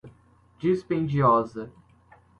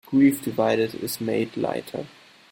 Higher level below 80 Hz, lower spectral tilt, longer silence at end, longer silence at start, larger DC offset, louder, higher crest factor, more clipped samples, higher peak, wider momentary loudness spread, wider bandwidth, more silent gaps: first, -58 dBFS vs -64 dBFS; first, -9 dB/octave vs -5.5 dB/octave; first, 0.7 s vs 0.45 s; about the same, 0.05 s vs 0.1 s; neither; about the same, -24 LUFS vs -24 LUFS; about the same, 18 dB vs 16 dB; neither; about the same, -8 dBFS vs -8 dBFS; about the same, 17 LU vs 16 LU; second, 8.6 kHz vs 17 kHz; neither